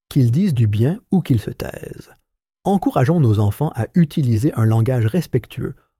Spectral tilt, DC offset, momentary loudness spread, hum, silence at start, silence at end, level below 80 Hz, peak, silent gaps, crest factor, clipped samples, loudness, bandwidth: -8.5 dB/octave; under 0.1%; 13 LU; none; 0.1 s; 0.25 s; -46 dBFS; -4 dBFS; none; 14 dB; under 0.1%; -18 LUFS; 15.5 kHz